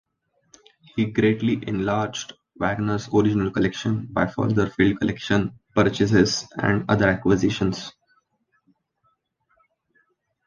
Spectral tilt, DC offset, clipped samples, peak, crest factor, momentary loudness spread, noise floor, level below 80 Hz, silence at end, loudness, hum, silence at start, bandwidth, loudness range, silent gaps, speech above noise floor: -6 dB/octave; under 0.1%; under 0.1%; -4 dBFS; 20 dB; 7 LU; -70 dBFS; -48 dBFS; 2.55 s; -22 LUFS; none; 0.95 s; 9.6 kHz; 4 LU; none; 48 dB